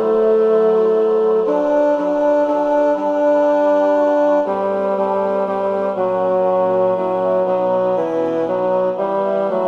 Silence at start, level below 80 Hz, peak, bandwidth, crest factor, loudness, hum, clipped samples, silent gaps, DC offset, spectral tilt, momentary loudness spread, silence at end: 0 s; -58 dBFS; -6 dBFS; 6.8 kHz; 10 dB; -16 LUFS; none; under 0.1%; none; under 0.1%; -8 dB/octave; 4 LU; 0 s